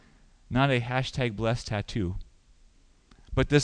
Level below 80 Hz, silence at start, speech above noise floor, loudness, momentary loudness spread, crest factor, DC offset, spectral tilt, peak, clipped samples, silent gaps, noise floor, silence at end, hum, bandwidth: -42 dBFS; 0.5 s; 32 dB; -29 LUFS; 8 LU; 24 dB; under 0.1%; -6 dB/octave; -6 dBFS; under 0.1%; none; -59 dBFS; 0 s; none; 9.8 kHz